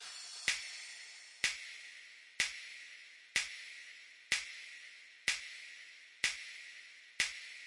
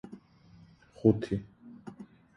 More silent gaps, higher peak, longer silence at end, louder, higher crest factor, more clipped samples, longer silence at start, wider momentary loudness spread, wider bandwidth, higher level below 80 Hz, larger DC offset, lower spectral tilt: neither; second, -20 dBFS vs -10 dBFS; second, 0 s vs 0.35 s; second, -39 LUFS vs -30 LUFS; about the same, 24 dB vs 24 dB; neither; about the same, 0 s vs 0.05 s; second, 16 LU vs 25 LU; about the same, 11.5 kHz vs 10.5 kHz; second, -76 dBFS vs -58 dBFS; neither; second, 2 dB/octave vs -9.5 dB/octave